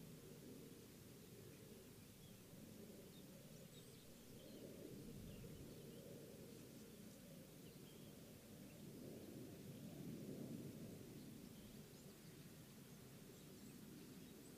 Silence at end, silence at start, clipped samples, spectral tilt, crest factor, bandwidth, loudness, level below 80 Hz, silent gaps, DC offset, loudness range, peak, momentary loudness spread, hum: 0 s; 0 s; under 0.1%; -5 dB/octave; 18 dB; 15.5 kHz; -59 LUFS; -76 dBFS; none; under 0.1%; 4 LU; -42 dBFS; 6 LU; none